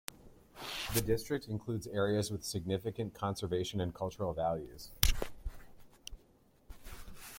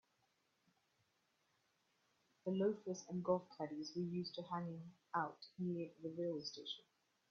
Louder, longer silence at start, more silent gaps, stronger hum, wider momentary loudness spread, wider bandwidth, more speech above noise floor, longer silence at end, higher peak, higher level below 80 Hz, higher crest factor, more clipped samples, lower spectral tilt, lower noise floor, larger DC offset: first, -36 LUFS vs -45 LUFS; second, 0.1 s vs 2.45 s; neither; neither; first, 19 LU vs 10 LU; first, 16.5 kHz vs 7.2 kHz; second, 30 dB vs 38 dB; second, 0 s vs 0.5 s; first, -2 dBFS vs -24 dBFS; first, -46 dBFS vs -86 dBFS; first, 36 dB vs 22 dB; neither; about the same, -4.5 dB/octave vs -5.5 dB/octave; second, -66 dBFS vs -82 dBFS; neither